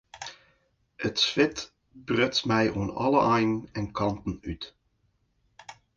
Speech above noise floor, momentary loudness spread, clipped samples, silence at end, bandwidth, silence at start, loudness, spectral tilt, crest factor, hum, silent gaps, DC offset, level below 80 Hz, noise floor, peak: 45 dB; 18 LU; under 0.1%; 0.25 s; 9.4 kHz; 0.15 s; -26 LUFS; -5 dB/octave; 22 dB; none; none; under 0.1%; -52 dBFS; -71 dBFS; -8 dBFS